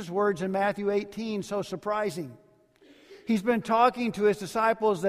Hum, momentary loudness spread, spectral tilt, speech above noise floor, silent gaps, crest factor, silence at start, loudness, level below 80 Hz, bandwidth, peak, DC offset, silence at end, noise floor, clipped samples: none; 10 LU; -5.5 dB/octave; 32 dB; none; 18 dB; 0 s; -27 LUFS; -66 dBFS; 15 kHz; -8 dBFS; under 0.1%; 0 s; -58 dBFS; under 0.1%